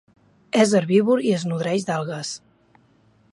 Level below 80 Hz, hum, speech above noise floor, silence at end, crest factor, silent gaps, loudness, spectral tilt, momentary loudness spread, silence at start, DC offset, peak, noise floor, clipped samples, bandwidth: -70 dBFS; none; 38 dB; 0.95 s; 18 dB; none; -21 LUFS; -5.5 dB/octave; 12 LU; 0.55 s; under 0.1%; -4 dBFS; -58 dBFS; under 0.1%; 11.5 kHz